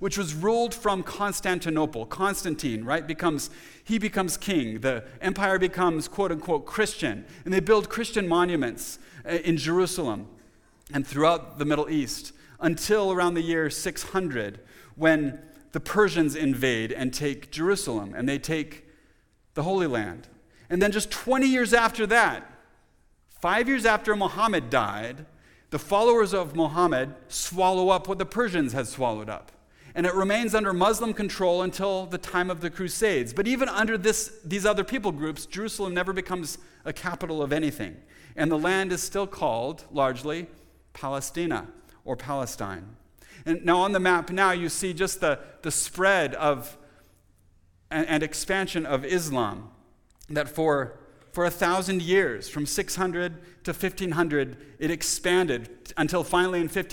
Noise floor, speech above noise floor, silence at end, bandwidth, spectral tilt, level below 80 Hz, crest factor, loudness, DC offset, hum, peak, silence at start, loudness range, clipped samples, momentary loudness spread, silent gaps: -62 dBFS; 36 dB; 0 s; 19 kHz; -4 dB/octave; -50 dBFS; 22 dB; -26 LUFS; under 0.1%; none; -4 dBFS; 0 s; 5 LU; under 0.1%; 11 LU; none